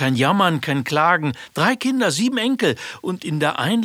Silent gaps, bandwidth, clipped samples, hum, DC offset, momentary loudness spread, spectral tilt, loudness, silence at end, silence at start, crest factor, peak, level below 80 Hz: none; 16.5 kHz; under 0.1%; none; under 0.1%; 9 LU; -5 dB/octave; -19 LUFS; 0 s; 0 s; 18 dB; -2 dBFS; -64 dBFS